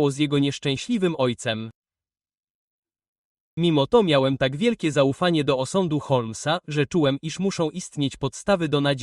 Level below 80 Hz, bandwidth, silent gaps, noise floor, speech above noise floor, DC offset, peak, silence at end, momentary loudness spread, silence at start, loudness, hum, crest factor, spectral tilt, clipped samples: -56 dBFS; 11.5 kHz; 1.75-1.82 s, 2.39-2.43 s, 2.50-2.83 s, 3.08-3.57 s; under -90 dBFS; over 68 dB; under 0.1%; -6 dBFS; 0 s; 8 LU; 0 s; -23 LUFS; none; 18 dB; -5.5 dB/octave; under 0.1%